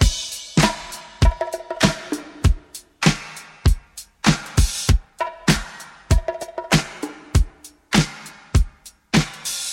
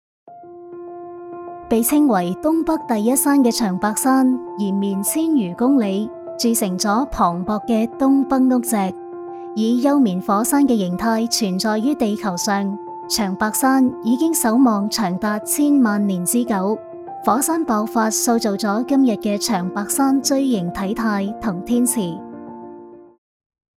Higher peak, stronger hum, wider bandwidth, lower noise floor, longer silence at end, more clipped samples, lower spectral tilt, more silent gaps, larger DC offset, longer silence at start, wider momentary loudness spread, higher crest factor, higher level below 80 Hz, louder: about the same, -2 dBFS vs -4 dBFS; neither; about the same, 16.5 kHz vs 17 kHz; about the same, -41 dBFS vs -39 dBFS; second, 0 s vs 0.75 s; neither; about the same, -4.5 dB/octave vs -4.5 dB/octave; neither; neither; second, 0 s vs 0.25 s; about the same, 12 LU vs 13 LU; first, 20 dB vs 14 dB; first, -26 dBFS vs -50 dBFS; second, -22 LUFS vs -18 LUFS